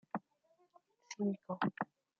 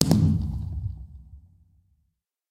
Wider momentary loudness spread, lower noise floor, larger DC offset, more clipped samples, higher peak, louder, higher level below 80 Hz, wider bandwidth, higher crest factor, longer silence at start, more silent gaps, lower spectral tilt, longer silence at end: second, 8 LU vs 24 LU; about the same, -75 dBFS vs -75 dBFS; neither; neither; second, -22 dBFS vs 0 dBFS; second, -41 LUFS vs -26 LUFS; second, -86 dBFS vs -40 dBFS; second, 7.2 kHz vs 16 kHz; second, 20 dB vs 28 dB; first, 0.15 s vs 0 s; neither; about the same, -5.5 dB/octave vs -6 dB/octave; second, 0.35 s vs 1.1 s